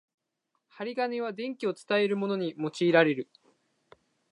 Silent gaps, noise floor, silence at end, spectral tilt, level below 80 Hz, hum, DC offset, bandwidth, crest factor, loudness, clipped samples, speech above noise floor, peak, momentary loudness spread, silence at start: none; -80 dBFS; 1.1 s; -6 dB/octave; -84 dBFS; none; under 0.1%; 11 kHz; 22 dB; -29 LUFS; under 0.1%; 52 dB; -8 dBFS; 13 LU; 0.75 s